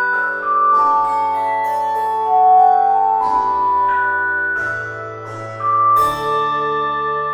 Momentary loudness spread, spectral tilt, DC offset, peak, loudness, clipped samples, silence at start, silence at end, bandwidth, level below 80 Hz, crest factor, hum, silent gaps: 10 LU; -4.5 dB/octave; under 0.1%; -2 dBFS; -16 LUFS; under 0.1%; 0 s; 0 s; 18 kHz; -54 dBFS; 14 dB; none; none